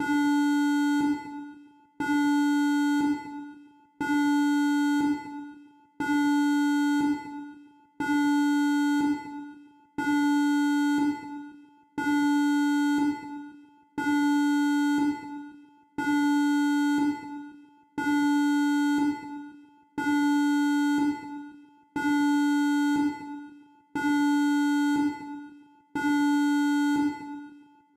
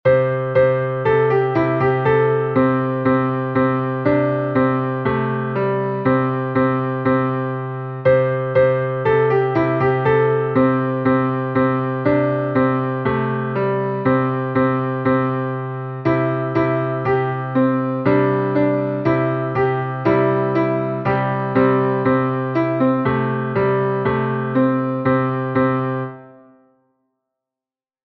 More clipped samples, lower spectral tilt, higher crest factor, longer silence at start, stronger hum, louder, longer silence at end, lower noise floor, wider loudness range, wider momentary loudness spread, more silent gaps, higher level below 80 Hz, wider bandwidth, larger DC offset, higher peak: neither; second, -3.5 dB/octave vs -10.5 dB/octave; about the same, 10 dB vs 14 dB; about the same, 0 s vs 0.05 s; neither; second, -26 LUFS vs -18 LUFS; second, 0.35 s vs 1.75 s; second, -52 dBFS vs under -90 dBFS; about the same, 2 LU vs 3 LU; first, 17 LU vs 4 LU; neither; second, -70 dBFS vs -50 dBFS; first, 13 kHz vs 4.9 kHz; neither; second, -16 dBFS vs -4 dBFS